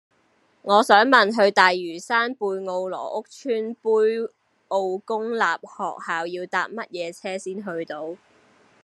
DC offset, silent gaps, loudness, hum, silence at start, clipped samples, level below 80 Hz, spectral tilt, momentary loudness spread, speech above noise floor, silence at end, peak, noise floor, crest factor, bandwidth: under 0.1%; none; -22 LUFS; none; 0.65 s; under 0.1%; -82 dBFS; -3.5 dB/octave; 15 LU; 41 dB; 0.7 s; -2 dBFS; -63 dBFS; 22 dB; 12.5 kHz